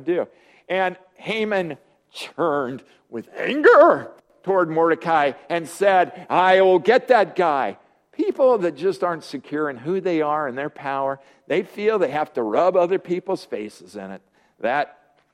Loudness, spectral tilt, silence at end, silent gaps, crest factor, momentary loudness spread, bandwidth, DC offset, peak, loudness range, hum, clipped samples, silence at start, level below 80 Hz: -20 LUFS; -5.5 dB/octave; 0.5 s; none; 20 dB; 19 LU; 13.5 kHz; under 0.1%; -2 dBFS; 6 LU; none; under 0.1%; 0 s; -72 dBFS